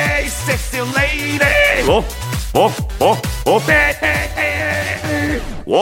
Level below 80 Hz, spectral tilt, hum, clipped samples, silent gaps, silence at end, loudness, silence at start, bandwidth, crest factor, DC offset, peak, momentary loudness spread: -28 dBFS; -4 dB/octave; none; under 0.1%; none; 0 s; -16 LUFS; 0 s; 17 kHz; 16 dB; under 0.1%; 0 dBFS; 7 LU